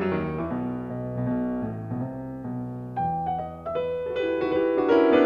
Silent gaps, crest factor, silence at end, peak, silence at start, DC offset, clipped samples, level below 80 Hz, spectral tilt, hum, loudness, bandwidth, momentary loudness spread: none; 18 dB; 0 s; -8 dBFS; 0 s; under 0.1%; under 0.1%; -54 dBFS; -9 dB/octave; none; -27 LUFS; 6.6 kHz; 11 LU